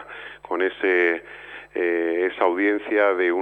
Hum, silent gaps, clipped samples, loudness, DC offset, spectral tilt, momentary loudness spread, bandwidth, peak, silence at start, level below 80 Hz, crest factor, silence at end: none; none; under 0.1%; -22 LUFS; under 0.1%; -5.5 dB/octave; 18 LU; 4.4 kHz; -6 dBFS; 0 s; -64 dBFS; 16 dB; 0 s